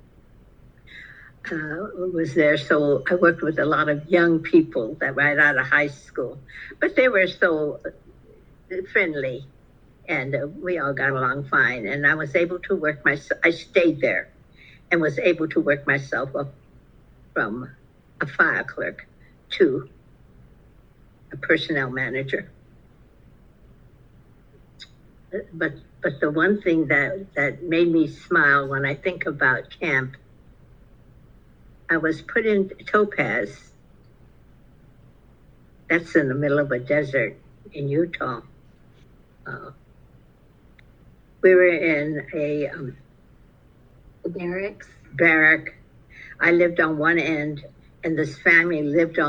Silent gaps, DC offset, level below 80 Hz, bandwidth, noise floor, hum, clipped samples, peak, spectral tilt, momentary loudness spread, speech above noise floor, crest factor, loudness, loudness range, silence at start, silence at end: none; under 0.1%; -54 dBFS; 7.6 kHz; -53 dBFS; none; under 0.1%; -2 dBFS; -7 dB/octave; 16 LU; 31 dB; 20 dB; -21 LUFS; 8 LU; 0.9 s; 0 s